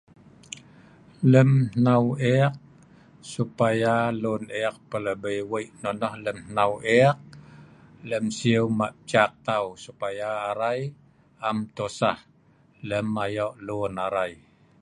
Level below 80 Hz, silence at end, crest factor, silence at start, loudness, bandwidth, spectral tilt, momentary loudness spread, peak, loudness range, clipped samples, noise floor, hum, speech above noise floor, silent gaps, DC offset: -60 dBFS; 0.45 s; 22 dB; 1.2 s; -25 LUFS; 11.5 kHz; -6.5 dB/octave; 14 LU; -4 dBFS; 6 LU; under 0.1%; -59 dBFS; none; 35 dB; none; under 0.1%